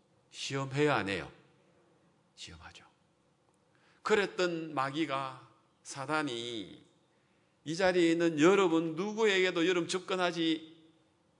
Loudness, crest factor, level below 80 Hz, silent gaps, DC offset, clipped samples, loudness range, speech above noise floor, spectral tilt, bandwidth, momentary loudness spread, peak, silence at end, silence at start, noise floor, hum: -31 LUFS; 22 dB; -74 dBFS; none; under 0.1%; under 0.1%; 9 LU; 40 dB; -4.5 dB/octave; 11 kHz; 21 LU; -12 dBFS; 0.65 s; 0.35 s; -71 dBFS; none